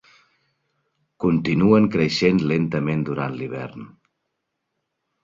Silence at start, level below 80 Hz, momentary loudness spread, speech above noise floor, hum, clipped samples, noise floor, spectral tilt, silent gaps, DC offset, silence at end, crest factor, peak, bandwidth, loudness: 1.2 s; -52 dBFS; 14 LU; 58 dB; none; under 0.1%; -78 dBFS; -7 dB/octave; none; under 0.1%; 1.35 s; 20 dB; -4 dBFS; 7.6 kHz; -20 LUFS